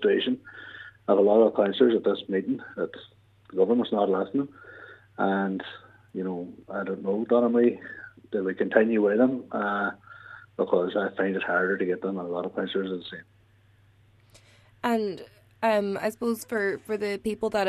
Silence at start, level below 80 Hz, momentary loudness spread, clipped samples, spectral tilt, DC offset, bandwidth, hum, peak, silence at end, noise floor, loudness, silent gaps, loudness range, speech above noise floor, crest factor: 0 s; -68 dBFS; 20 LU; under 0.1%; -6 dB/octave; under 0.1%; 13.5 kHz; none; -4 dBFS; 0 s; -60 dBFS; -26 LUFS; none; 6 LU; 34 dB; 24 dB